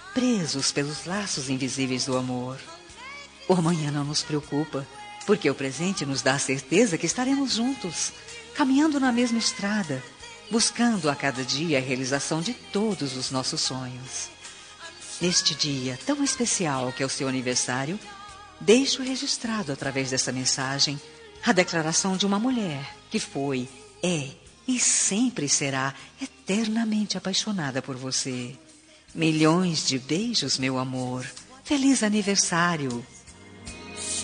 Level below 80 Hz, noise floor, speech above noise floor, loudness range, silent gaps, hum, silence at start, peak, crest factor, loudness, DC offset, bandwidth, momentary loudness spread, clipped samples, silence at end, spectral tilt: -62 dBFS; -52 dBFS; 27 dB; 3 LU; none; none; 0 s; -4 dBFS; 22 dB; -25 LUFS; under 0.1%; 10 kHz; 16 LU; under 0.1%; 0 s; -3.5 dB/octave